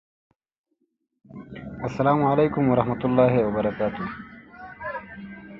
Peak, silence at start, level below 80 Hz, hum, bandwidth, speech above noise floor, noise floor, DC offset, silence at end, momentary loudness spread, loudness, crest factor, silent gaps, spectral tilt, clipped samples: -6 dBFS; 1.35 s; -52 dBFS; none; 7 kHz; 21 dB; -43 dBFS; under 0.1%; 0 s; 21 LU; -23 LUFS; 20 dB; none; -9.5 dB/octave; under 0.1%